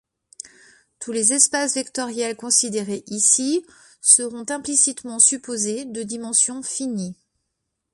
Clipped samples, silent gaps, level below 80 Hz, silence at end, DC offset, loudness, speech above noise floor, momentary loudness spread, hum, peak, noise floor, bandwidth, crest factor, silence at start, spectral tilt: under 0.1%; none; -68 dBFS; 0.8 s; under 0.1%; -19 LUFS; 57 dB; 15 LU; none; 0 dBFS; -78 dBFS; 11.5 kHz; 22 dB; 0.45 s; -1.5 dB/octave